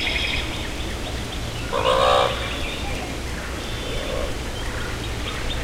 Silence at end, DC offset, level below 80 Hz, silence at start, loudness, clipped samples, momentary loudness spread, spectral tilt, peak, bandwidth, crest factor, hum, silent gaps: 0 s; under 0.1%; -32 dBFS; 0 s; -25 LUFS; under 0.1%; 11 LU; -4 dB/octave; -6 dBFS; 16 kHz; 18 dB; none; none